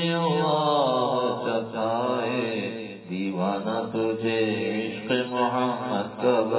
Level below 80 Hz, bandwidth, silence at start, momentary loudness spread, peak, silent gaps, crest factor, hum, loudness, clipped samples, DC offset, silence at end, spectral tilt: -70 dBFS; 4 kHz; 0 s; 7 LU; -10 dBFS; none; 14 dB; none; -26 LUFS; under 0.1%; under 0.1%; 0 s; -10 dB/octave